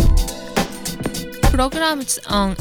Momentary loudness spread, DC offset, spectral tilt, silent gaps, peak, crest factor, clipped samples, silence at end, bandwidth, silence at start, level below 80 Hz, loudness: 8 LU; under 0.1%; -4 dB/octave; none; -2 dBFS; 16 dB; under 0.1%; 0 s; 19 kHz; 0 s; -22 dBFS; -20 LUFS